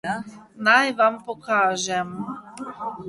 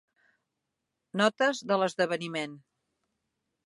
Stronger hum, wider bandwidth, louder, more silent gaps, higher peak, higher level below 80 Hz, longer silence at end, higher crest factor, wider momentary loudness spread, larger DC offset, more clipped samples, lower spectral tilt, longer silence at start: neither; about the same, 11.5 kHz vs 11.5 kHz; first, -21 LUFS vs -29 LUFS; neither; first, -4 dBFS vs -10 dBFS; first, -66 dBFS vs -82 dBFS; second, 0 s vs 1.05 s; about the same, 20 dB vs 22 dB; first, 17 LU vs 11 LU; neither; neither; second, -3 dB/octave vs -4.5 dB/octave; second, 0.05 s vs 1.15 s